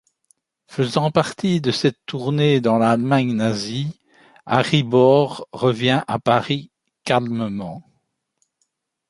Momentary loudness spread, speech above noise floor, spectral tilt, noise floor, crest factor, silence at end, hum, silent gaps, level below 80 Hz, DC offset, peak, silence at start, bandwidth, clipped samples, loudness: 11 LU; 53 dB; -6.5 dB/octave; -72 dBFS; 20 dB; 1.3 s; none; none; -58 dBFS; under 0.1%; 0 dBFS; 0.7 s; 11.5 kHz; under 0.1%; -19 LUFS